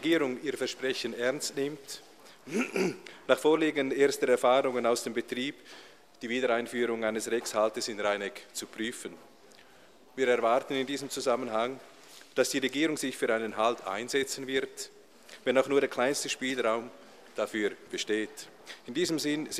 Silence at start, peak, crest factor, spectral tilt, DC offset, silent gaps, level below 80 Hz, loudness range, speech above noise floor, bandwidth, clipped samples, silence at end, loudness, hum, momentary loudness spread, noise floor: 0 s; -8 dBFS; 22 dB; -3 dB/octave; under 0.1%; none; -76 dBFS; 5 LU; 28 dB; 15 kHz; under 0.1%; 0 s; -30 LUFS; none; 16 LU; -58 dBFS